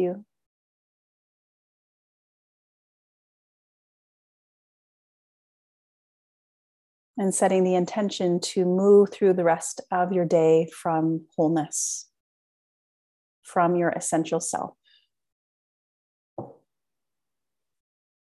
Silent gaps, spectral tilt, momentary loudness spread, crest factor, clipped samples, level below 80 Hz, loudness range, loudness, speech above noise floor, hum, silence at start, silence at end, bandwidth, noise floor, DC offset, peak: 0.46-7.14 s, 12.20-13.42 s, 15.32-16.37 s; -5 dB/octave; 15 LU; 20 dB; under 0.1%; -76 dBFS; 10 LU; -23 LUFS; 66 dB; none; 0 s; 1.85 s; 12.5 kHz; -89 dBFS; under 0.1%; -8 dBFS